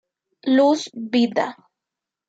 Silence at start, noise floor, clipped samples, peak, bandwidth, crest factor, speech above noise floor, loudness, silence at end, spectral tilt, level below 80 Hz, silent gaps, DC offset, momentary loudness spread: 0.45 s; -86 dBFS; under 0.1%; -6 dBFS; 8 kHz; 16 dB; 67 dB; -20 LUFS; 0.75 s; -4.5 dB/octave; -74 dBFS; none; under 0.1%; 11 LU